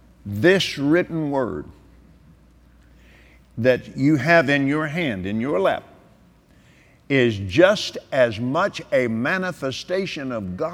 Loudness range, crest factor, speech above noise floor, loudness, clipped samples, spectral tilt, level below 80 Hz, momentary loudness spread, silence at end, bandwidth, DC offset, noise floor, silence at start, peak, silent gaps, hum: 4 LU; 20 dB; 33 dB; -21 LUFS; under 0.1%; -6 dB/octave; -54 dBFS; 11 LU; 0 s; 16 kHz; under 0.1%; -53 dBFS; 0.25 s; -2 dBFS; none; none